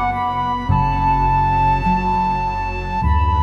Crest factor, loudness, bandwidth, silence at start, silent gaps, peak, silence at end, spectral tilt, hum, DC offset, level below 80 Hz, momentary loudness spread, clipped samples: 12 dB; -18 LUFS; 7.4 kHz; 0 s; none; -4 dBFS; 0 s; -8 dB/octave; none; under 0.1%; -24 dBFS; 5 LU; under 0.1%